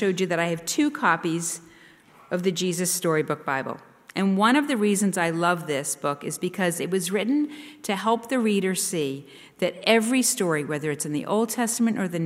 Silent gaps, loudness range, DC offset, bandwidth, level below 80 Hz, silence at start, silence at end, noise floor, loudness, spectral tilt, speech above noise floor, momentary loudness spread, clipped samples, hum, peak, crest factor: none; 2 LU; under 0.1%; 16 kHz; -72 dBFS; 0 s; 0 s; -52 dBFS; -24 LUFS; -4 dB/octave; 28 dB; 9 LU; under 0.1%; none; -6 dBFS; 18 dB